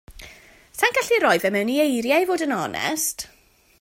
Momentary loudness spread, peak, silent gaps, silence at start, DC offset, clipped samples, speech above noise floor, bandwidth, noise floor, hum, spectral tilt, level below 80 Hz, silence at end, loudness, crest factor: 9 LU; -4 dBFS; none; 0.1 s; under 0.1%; under 0.1%; 27 dB; 16.5 kHz; -48 dBFS; none; -3 dB/octave; -56 dBFS; 0.55 s; -21 LUFS; 18 dB